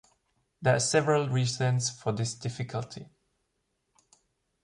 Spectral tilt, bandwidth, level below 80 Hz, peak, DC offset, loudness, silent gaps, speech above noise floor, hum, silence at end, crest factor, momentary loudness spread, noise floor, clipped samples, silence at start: -4.5 dB/octave; 11 kHz; -64 dBFS; -12 dBFS; under 0.1%; -28 LUFS; none; 50 dB; none; 1.6 s; 20 dB; 12 LU; -78 dBFS; under 0.1%; 0.6 s